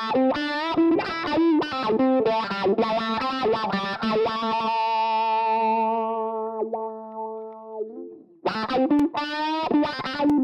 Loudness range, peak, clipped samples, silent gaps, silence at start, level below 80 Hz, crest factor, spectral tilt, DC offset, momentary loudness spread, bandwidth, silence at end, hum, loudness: 5 LU; -12 dBFS; under 0.1%; none; 0 s; -60 dBFS; 12 dB; -6 dB/octave; under 0.1%; 13 LU; 8.6 kHz; 0 s; none; -24 LUFS